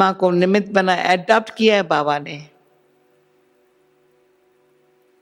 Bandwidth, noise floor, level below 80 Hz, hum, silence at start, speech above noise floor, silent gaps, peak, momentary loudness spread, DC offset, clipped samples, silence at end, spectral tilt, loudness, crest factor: 11.5 kHz; -59 dBFS; -70 dBFS; 50 Hz at -50 dBFS; 0 s; 42 dB; none; 0 dBFS; 9 LU; under 0.1%; under 0.1%; 2.8 s; -5.5 dB/octave; -17 LUFS; 20 dB